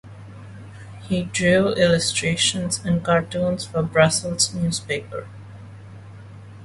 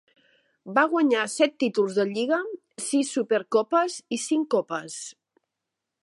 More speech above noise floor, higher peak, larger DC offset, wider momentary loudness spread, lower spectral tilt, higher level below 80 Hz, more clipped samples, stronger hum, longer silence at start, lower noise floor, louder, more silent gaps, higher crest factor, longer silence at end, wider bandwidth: second, 19 dB vs 60 dB; first, -2 dBFS vs -6 dBFS; neither; first, 24 LU vs 11 LU; about the same, -4 dB/octave vs -3.5 dB/octave; first, -48 dBFS vs -82 dBFS; neither; neither; second, 0.05 s vs 0.65 s; second, -40 dBFS vs -85 dBFS; first, -20 LUFS vs -25 LUFS; neither; about the same, 20 dB vs 20 dB; second, 0 s vs 0.9 s; about the same, 11.5 kHz vs 11.5 kHz